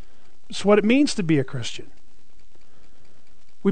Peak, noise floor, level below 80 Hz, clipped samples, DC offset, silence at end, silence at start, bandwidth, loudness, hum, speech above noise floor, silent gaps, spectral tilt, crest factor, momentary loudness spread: -4 dBFS; -58 dBFS; -56 dBFS; under 0.1%; 4%; 0 s; 0.5 s; 9.4 kHz; -21 LUFS; none; 38 dB; none; -5.5 dB/octave; 20 dB; 17 LU